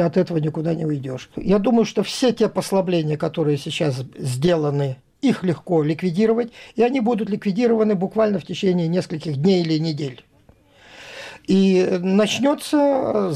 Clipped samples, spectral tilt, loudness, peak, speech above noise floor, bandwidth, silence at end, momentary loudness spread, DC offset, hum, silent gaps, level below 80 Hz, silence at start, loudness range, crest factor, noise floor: under 0.1%; -6.5 dB/octave; -20 LUFS; -8 dBFS; 34 dB; 14 kHz; 0 s; 9 LU; under 0.1%; none; none; -54 dBFS; 0 s; 2 LU; 12 dB; -53 dBFS